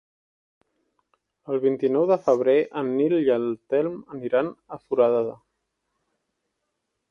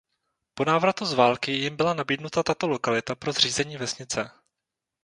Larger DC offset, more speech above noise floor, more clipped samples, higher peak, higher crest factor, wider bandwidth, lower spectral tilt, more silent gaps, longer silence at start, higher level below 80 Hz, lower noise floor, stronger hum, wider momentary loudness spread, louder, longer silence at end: neither; second, 56 dB vs 61 dB; neither; second, -8 dBFS vs -4 dBFS; about the same, 18 dB vs 22 dB; second, 7 kHz vs 11 kHz; first, -8 dB/octave vs -3.5 dB/octave; neither; first, 1.5 s vs 0.55 s; second, -72 dBFS vs -62 dBFS; second, -79 dBFS vs -86 dBFS; neither; about the same, 10 LU vs 8 LU; about the same, -23 LUFS vs -25 LUFS; first, 1.75 s vs 0.75 s